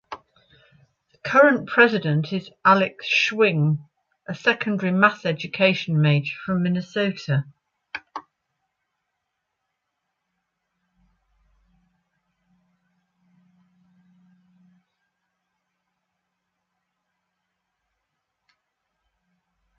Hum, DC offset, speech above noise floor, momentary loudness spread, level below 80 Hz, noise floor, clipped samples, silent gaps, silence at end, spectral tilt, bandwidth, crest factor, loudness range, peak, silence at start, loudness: none; under 0.1%; 59 dB; 20 LU; -68 dBFS; -79 dBFS; under 0.1%; none; 11.6 s; -6.5 dB/octave; 7.2 kHz; 22 dB; 15 LU; -2 dBFS; 0.1 s; -21 LUFS